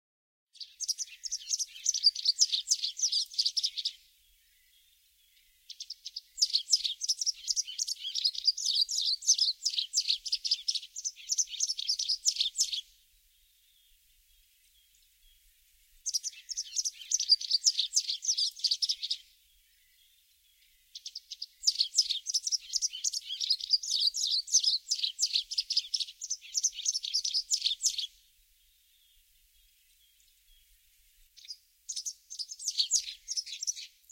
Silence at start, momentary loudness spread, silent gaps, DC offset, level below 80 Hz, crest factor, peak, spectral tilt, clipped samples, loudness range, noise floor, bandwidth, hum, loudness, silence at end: 0.55 s; 14 LU; none; under 0.1%; -74 dBFS; 24 dB; -10 dBFS; 8.5 dB/octave; under 0.1%; 9 LU; -67 dBFS; 17 kHz; none; -29 LUFS; 0.25 s